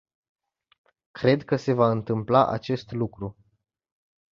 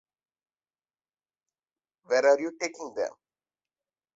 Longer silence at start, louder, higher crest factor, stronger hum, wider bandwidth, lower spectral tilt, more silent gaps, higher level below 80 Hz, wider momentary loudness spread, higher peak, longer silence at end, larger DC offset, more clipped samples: second, 1.15 s vs 2.1 s; first, -24 LUFS vs -27 LUFS; about the same, 22 dB vs 22 dB; neither; about the same, 7.2 kHz vs 7.8 kHz; first, -8 dB/octave vs -2.5 dB/octave; neither; first, -58 dBFS vs -80 dBFS; about the same, 10 LU vs 12 LU; first, -4 dBFS vs -10 dBFS; about the same, 1.05 s vs 1.05 s; neither; neither